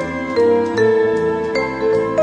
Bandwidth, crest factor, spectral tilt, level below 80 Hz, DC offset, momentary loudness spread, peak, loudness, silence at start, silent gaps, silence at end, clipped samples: 8.6 kHz; 12 dB; -6.5 dB/octave; -46 dBFS; under 0.1%; 5 LU; -4 dBFS; -17 LUFS; 0 s; none; 0 s; under 0.1%